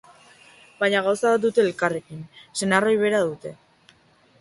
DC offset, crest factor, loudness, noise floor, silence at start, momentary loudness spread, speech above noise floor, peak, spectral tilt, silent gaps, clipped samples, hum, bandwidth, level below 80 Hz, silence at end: under 0.1%; 20 dB; -22 LUFS; -58 dBFS; 0.8 s; 18 LU; 36 dB; -4 dBFS; -4.5 dB/octave; none; under 0.1%; none; 11.5 kHz; -66 dBFS; 0.85 s